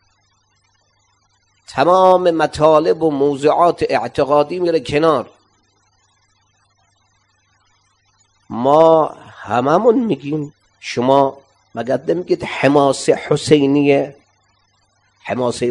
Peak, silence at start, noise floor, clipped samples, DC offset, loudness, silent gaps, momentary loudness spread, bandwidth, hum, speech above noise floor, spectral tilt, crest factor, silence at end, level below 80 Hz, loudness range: 0 dBFS; 1.7 s; -61 dBFS; under 0.1%; under 0.1%; -15 LUFS; none; 13 LU; 11 kHz; 50 Hz at -50 dBFS; 46 dB; -6 dB/octave; 16 dB; 0 s; -54 dBFS; 6 LU